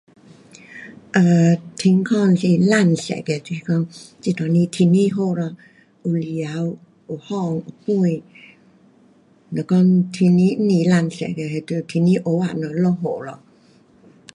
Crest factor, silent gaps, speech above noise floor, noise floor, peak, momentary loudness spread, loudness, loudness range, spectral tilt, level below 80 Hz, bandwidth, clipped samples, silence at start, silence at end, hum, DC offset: 16 dB; none; 35 dB; -53 dBFS; -2 dBFS; 14 LU; -19 LUFS; 7 LU; -7.5 dB/octave; -62 dBFS; 11 kHz; under 0.1%; 0.7 s; 1 s; none; under 0.1%